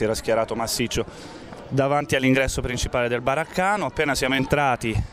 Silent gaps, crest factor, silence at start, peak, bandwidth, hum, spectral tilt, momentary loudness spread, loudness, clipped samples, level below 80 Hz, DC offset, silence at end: none; 20 dB; 0 s; -4 dBFS; 16 kHz; none; -4.5 dB/octave; 8 LU; -23 LUFS; under 0.1%; -38 dBFS; under 0.1%; 0 s